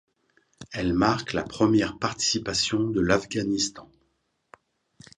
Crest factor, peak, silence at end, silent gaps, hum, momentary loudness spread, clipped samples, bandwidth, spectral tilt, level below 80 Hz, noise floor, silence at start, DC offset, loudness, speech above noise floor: 22 dB; -4 dBFS; 1.35 s; none; none; 7 LU; under 0.1%; 11 kHz; -4 dB/octave; -50 dBFS; -73 dBFS; 0.6 s; under 0.1%; -25 LUFS; 48 dB